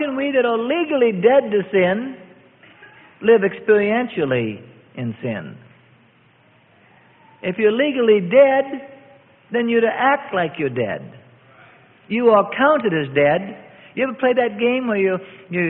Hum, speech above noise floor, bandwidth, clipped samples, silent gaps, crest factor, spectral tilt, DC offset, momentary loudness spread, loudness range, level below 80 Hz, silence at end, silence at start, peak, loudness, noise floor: none; 37 dB; 4 kHz; under 0.1%; none; 18 dB; -11 dB/octave; under 0.1%; 14 LU; 6 LU; -62 dBFS; 0 s; 0 s; -2 dBFS; -18 LUFS; -54 dBFS